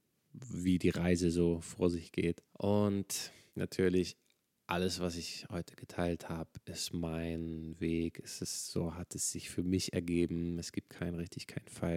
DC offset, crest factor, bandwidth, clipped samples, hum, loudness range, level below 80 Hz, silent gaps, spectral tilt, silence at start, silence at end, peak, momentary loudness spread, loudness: under 0.1%; 20 dB; 16.5 kHz; under 0.1%; none; 5 LU; -58 dBFS; none; -5 dB/octave; 0.35 s; 0 s; -16 dBFS; 12 LU; -36 LUFS